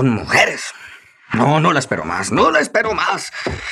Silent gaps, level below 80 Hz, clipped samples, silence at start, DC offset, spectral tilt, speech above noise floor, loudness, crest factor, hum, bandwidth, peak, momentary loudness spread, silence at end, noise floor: none; -46 dBFS; under 0.1%; 0 s; under 0.1%; -4.5 dB/octave; 24 dB; -16 LUFS; 16 dB; none; 14 kHz; -2 dBFS; 11 LU; 0 s; -41 dBFS